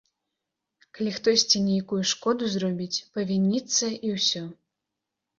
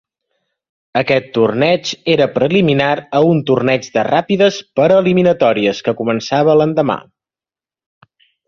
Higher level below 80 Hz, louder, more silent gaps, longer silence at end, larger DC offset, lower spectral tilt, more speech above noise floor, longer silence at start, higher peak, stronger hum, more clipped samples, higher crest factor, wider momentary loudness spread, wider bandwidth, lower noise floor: second, -68 dBFS vs -54 dBFS; second, -25 LUFS vs -14 LUFS; neither; second, 0.85 s vs 1.5 s; neither; second, -3.5 dB/octave vs -6 dB/octave; second, 59 dB vs over 77 dB; about the same, 0.95 s vs 0.95 s; second, -8 dBFS vs 0 dBFS; neither; neither; first, 20 dB vs 14 dB; first, 9 LU vs 6 LU; about the same, 7.6 kHz vs 7.4 kHz; second, -85 dBFS vs under -90 dBFS